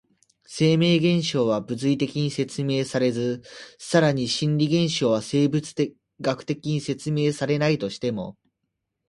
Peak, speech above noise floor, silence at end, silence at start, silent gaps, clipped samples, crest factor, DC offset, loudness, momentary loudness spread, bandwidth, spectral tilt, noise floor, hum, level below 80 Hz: -4 dBFS; 56 dB; 0.75 s; 0.5 s; none; under 0.1%; 20 dB; under 0.1%; -23 LUFS; 9 LU; 11.5 kHz; -6 dB/octave; -79 dBFS; none; -60 dBFS